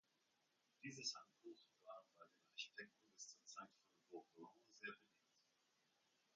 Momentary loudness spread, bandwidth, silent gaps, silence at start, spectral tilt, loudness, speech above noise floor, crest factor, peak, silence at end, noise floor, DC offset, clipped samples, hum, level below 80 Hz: 16 LU; 9 kHz; none; 0.8 s; -1.5 dB/octave; -57 LUFS; 28 dB; 26 dB; -34 dBFS; 0.95 s; -85 dBFS; under 0.1%; under 0.1%; none; under -90 dBFS